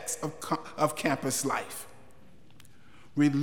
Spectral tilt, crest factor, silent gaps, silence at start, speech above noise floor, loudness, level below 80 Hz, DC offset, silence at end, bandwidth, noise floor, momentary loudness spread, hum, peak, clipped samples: -4.5 dB/octave; 20 dB; none; 0 s; 28 dB; -31 LUFS; -68 dBFS; 0.4%; 0 s; 19.5 kHz; -57 dBFS; 13 LU; none; -12 dBFS; under 0.1%